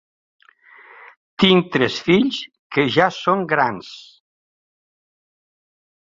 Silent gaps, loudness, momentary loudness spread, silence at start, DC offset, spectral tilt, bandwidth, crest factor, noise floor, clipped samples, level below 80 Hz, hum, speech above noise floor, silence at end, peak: 2.59-2.70 s; -18 LUFS; 19 LU; 1.4 s; under 0.1%; -6 dB/octave; 7.6 kHz; 20 dB; -48 dBFS; under 0.1%; -58 dBFS; none; 31 dB; 2.15 s; -2 dBFS